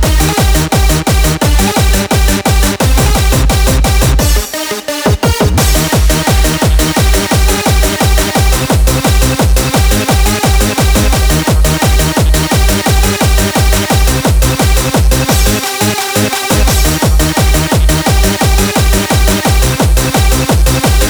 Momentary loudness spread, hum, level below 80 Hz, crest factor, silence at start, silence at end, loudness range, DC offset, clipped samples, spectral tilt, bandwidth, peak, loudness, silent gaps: 1 LU; none; -12 dBFS; 8 dB; 0 s; 0 s; 1 LU; under 0.1%; under 0.1%; -4 dB/octave; over 20 kHz; 0 dBFS; -10 LUFS; none